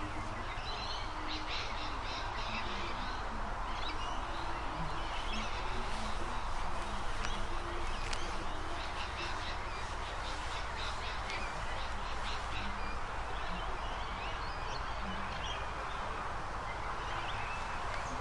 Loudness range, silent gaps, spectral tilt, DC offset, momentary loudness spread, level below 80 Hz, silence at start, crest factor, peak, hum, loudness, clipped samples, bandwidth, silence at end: 1 LU; none; -4 dB/octave; under 0.1%; 2 LU; -42 dBFS; 0 s; 20 dB; -16 dBFS; none; -39 LUFS; under 0.1%; 11.5 kHz; 0 s